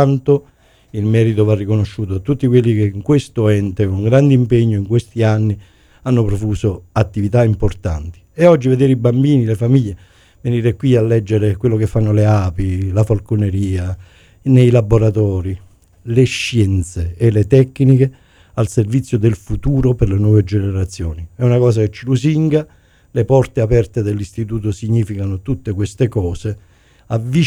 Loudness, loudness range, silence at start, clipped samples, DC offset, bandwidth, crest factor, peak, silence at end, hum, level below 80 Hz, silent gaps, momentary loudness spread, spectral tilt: -15 LUFS; 3 LU; 0 s; under 0.1%; under 0.1%; 11.5 kHz; 14 dB; 0 dBFS; 0 s; none; -34 dBFS; none; 10 LU; -8 dB/octave